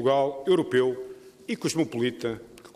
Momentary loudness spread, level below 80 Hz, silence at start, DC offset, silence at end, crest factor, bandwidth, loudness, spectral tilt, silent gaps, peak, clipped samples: 16 LU; -66 dBFS; 0 s; under 0.1%; 0.05 s; 16 dB; 14.5 kHz; -26 LUFS; -5 dB/octave; none; -10 dBFS; under 0.1%